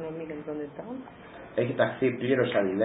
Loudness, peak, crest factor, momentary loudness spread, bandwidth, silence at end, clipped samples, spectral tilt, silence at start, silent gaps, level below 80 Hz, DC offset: -29 LUFS; -10 dBFS; 20 dB; 16 LU; 4 kHz; 0 s; under 0.1%; -10.5 dB/octave; 0 s; none; -64 dBFS; under 0.1%